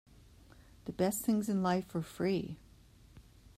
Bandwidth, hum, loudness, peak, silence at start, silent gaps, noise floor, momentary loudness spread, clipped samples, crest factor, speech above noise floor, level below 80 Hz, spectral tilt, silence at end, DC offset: 16 kHz; none; -34 LUFS; -18 dBFS; 0.85 s; none; -60 dBFS; 15 LU; under 0.1%; 18 dB; 26 dB; -62 dBFS; -6 dB/octave; 0.35 s; under 0.1%